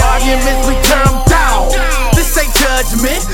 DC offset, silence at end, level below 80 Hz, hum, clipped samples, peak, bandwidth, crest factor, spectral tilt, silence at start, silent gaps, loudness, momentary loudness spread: under 0.1%; 0 s; -14 dBFS; none; 0.1%; 0 dBFS; 17.5 kHz; 10 dB; -3.5 dB/octave; 0 s; none; -12 LUFS; 4 LU